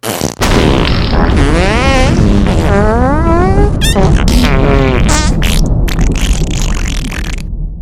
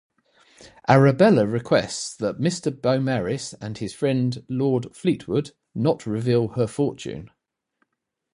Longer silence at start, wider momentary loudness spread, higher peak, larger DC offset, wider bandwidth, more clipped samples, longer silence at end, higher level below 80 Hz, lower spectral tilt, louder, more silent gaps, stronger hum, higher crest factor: second, 0.05 s vs 0.6 s; second, 7 LU vs 14 LU; about the same, 0 dBFS vs -2 dBFS; neither; first, 15.5 kHz vs 11.5 kHz; first, 0.7% vs under 0.1%; second, 0 s vs 1.05 s; first, -12 dBFS vs -58 dBFS; about the same, -5.5 dB/octave vs -6.5 dB/octave; first, -11 LUFS vs -22 LUFS; neither; neither; second, 10 dB vs 22 dB